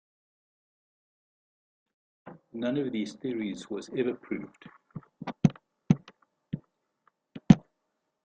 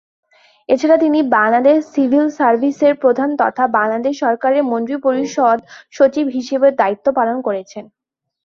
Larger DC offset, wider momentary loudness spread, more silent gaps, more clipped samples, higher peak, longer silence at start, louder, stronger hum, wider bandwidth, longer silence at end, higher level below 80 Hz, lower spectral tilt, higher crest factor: neither; first, 24 LU vs 6 LU; neither; neither; about the same, -2 dBFS vs -2 dBFS; first, 2.25 s vs 0.7 s; second, -29 LUFS vs -15 LUFS; neither; first, 8.8 kHz vs 7.2 kHz; about the same, 0.65 s vs 0.6 s; about the same, -60 dBFS vs -62 dBFS; first, -8 dB/octave vs -5 dB/octave; first, 30 dB vs 14 dB